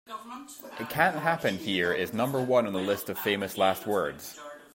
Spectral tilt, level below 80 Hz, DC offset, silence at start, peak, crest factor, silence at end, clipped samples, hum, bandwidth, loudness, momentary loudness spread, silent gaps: -4.5 dB/octave; -66 dBFS; under 0.1%; 0.1 s; -8 dBFS; 22 dB; 0.1 s; under 0.1%; none; 16.5 kHz; -28 LUFS; 16 LU; none